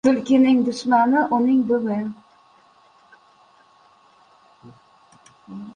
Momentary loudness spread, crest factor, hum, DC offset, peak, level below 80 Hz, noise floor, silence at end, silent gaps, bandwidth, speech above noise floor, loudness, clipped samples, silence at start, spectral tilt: 15 LU; 18 dB; none; under 0.1%; -4 dBFS; -66 dBFS; -55 dBFS; 0.05 s; none; 9.6 kHz; 36 dB; -19 LUFS; under 0.1%; 0.05 s; -6 dB/octave